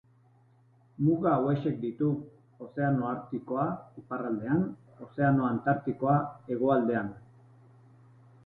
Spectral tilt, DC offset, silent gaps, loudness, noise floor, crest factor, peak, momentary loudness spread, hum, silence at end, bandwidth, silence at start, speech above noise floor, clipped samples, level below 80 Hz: -11.5 dB/octave; under 0.1%; none; -30 LUFS; -62 dBFS; 18 dB; -12 dBFS; 13 LU; none; 1.25 s; 4.3 kHz; 1 s; 33 dB; under 0.1%; -64 dBFS